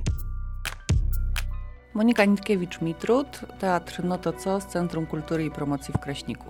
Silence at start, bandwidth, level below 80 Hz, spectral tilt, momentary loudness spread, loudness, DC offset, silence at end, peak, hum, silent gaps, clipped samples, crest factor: 0 s; 19 kHz; -34 dBFS; -6 dB/octave; 12 LU; -27 LUFS; under 0.1%; 0 s; -6 dBFS; none; none; under 0.1%; 20 dB